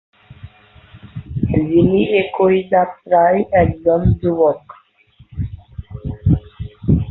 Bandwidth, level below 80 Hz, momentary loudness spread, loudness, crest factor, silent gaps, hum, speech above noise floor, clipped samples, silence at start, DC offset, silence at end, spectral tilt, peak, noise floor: 4.1 kHz; -30 dBFS; 18 LU; -16 LUFS; 14 dB; none; none; 36 dB; under 0.1%; 0.3 s; under 0.1%; 0 s; -11.5 dB/octave; -2 dBFS; -50 dBFS